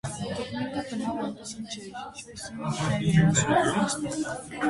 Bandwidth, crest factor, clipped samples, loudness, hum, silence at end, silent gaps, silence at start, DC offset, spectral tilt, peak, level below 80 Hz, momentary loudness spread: 11.5 kHz; 18 dB; under 0.1%; -27 LUFS; none; 0 s; none; 0.05 s; under 0.1%; -5 dB/octave; -10 dBFS; -52 dBFS; 17 LU